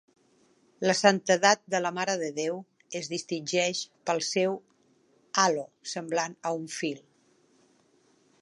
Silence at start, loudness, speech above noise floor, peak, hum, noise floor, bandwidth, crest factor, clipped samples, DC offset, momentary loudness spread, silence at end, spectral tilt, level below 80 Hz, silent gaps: 0.8 s; -28 LUFS; 38 dB; -4 dBFS; none; -66 dBFS; 11.5 kHz; 26 dB; under 0.1%; under 0.1%; 14 LU; 1.45 s; -3 dB/octave; -84 dBFS; none